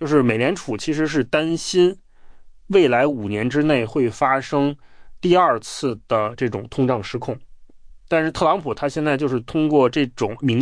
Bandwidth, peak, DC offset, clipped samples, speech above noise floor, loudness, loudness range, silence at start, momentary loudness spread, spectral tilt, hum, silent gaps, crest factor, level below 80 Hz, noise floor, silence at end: 10.5 kHz; -4 dBFS; under 0.1%; under 0.1%; 23 dB; -20 LUFS; 3 LU; 0 s; 9 LU; -6 dB/octave; none; none; 16 dB; -50 dBFS; -42 dBFS; 0 s